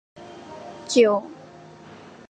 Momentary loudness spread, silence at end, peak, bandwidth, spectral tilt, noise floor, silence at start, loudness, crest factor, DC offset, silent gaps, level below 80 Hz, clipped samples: 26 LU; 0.95 s; -6 dBFS; 9.4 kHz; -3.5 dB/octave; -45 dBFS; 0.2 s; -20 LUFS; 20 dB; under 0.1%; none; -68 dBFS; under 0.1%